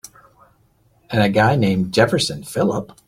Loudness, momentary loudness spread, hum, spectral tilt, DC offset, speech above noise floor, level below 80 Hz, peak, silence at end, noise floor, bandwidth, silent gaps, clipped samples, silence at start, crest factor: -18 LUFS; 6 LU; none; -5.5 dB/octave; under 0.1%; 41 dB; -50 dBFS; -2 dBFS; 0.2 s; -58 dBFS; 16 kHz; none; under 0.1%; 1.1 s; 18 dB